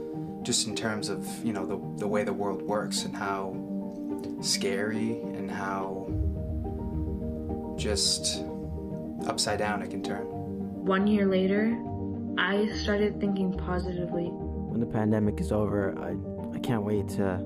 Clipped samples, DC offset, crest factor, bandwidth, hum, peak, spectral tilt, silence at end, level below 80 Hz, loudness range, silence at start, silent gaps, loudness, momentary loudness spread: under 0.1%; under 0.1%; 18 dB; 15.5 kHz; none; -12 dBFS; -4.5 dB/octave; 0 s; -44 dBFS; 4 LU; 0 s; none; -30 LUFS; 9 LU